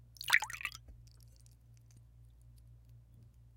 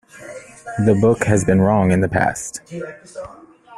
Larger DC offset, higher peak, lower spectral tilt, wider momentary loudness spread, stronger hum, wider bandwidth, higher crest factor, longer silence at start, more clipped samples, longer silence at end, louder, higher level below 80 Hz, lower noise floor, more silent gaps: neither; second, -10 dBFS vs 0 dBFS; second, 0 dB/octave vs -7 dB/octave; first, 28 LU vs 21 LU; neither; first, 17 kHz vs 12.5 kHz; first, 34 dB vs 18 dB; about the same, 0.2 s vs 0.15 s; neither; first, 0.3 s vs 0 s; second, -33 LUFS vs -17 LUFS; second, -62 dBFS vs -46 dBFS; first, -60 dBFS vs -37 dBFS; neither